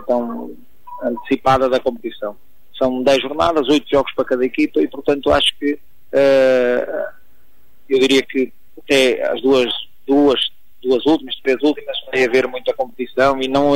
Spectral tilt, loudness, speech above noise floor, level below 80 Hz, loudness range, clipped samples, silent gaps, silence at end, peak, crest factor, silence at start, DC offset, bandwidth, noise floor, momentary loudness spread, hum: -4.5 dB/octave; -17 LUFS; 41 dB; -46 dBFS; 2 LU; under 0.1%; none; 0 s; -4 dBFS; 14 dB; 0 s; 2%; 16 kHz; -57 dBFS; 12 LU; none